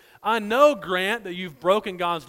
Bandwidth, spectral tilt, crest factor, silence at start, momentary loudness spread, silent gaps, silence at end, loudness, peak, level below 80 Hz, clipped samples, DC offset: 16.5 kHz; -4.5 dB/octave; 20 dB; 0.25 s; 9 LU; none; 0.05 s; -22 LUFS; -4 dBFS; -62 dBFS; under 0.1%; under 0.1%